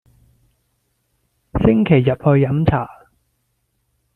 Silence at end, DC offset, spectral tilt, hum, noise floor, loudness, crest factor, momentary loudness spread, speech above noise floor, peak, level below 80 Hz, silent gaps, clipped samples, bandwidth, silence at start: 1.25 s; under 0.1%; -10.5 dB/octave; none; -68 dBFS; -16 LUFS; 18 dB; 11 LU; 54 dB; -2 dBFS; -38 dBFS; none; under 0.1%; 4.4 kHz; 1.55 s